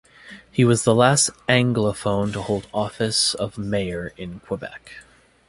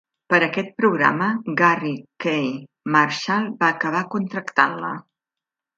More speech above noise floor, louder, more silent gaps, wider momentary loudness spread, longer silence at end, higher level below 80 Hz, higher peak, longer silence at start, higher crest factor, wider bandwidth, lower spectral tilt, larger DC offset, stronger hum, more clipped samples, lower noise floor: second, 24 dB vs 67 dB; about the same, -21 LUFS vs -21 LUFS; neither; first, 15 LU vs 10 LU; second, 0.45 s vs 0.75 s; first, -50 dBFS vs -72 dBFS; about the same, -2 dBFS vs 0 dBFS; about the same, 0.25 s vs 0.3 s; about the same, 20 dB vs 22 dB; first, 11.5 kHz vs 7.8 kHz; second, -4 dB/octave vs -5.5 dB/octave; neither; neither; neither; second, -45 dBFS vs -88 dBFS